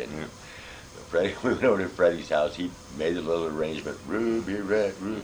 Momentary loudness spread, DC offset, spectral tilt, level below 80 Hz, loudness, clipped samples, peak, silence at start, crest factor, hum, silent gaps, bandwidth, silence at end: 16 LU; under 0.1%; -5.5 dB/octave; -54 dBFS; -27 LUFS; under 0.1%; -10 dBFS; 0 s; 18 dB; none; none; over 20 kHz; 0 s